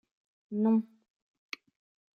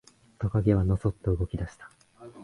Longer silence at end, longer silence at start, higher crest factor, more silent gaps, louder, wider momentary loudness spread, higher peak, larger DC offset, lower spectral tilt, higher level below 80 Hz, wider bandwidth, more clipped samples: first, 1.35 s vs 0 s; about the same, 0.5 s vs 0.4 s; about the same, 18 dB vs 20 dB; neither; about the same, -30 LUFS vs -28 LUFS; first, 17 LU vs 11 LU; second, -18 dBFS vs -10 dBFS; neither; second, -8 dB/octave vs -9.5 dB/octave; second, -86 dBFS vs -40 dBFS; second, 6.8 kHz vs 10.5 kHz; neither